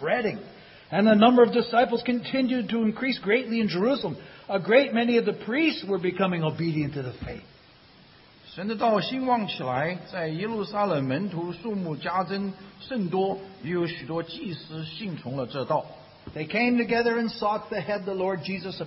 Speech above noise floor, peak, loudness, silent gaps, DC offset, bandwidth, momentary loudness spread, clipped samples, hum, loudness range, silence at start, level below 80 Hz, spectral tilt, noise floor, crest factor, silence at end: 28 dB; -6 dBFS; -26 LUFS; none; under 0.1%; 5.8 kHz; 14 LU; under 0.1%; none; 8 LU; 0 s; -60 dBFS; -10 dB/octave; -54 dBFS; 20 dB; 0 s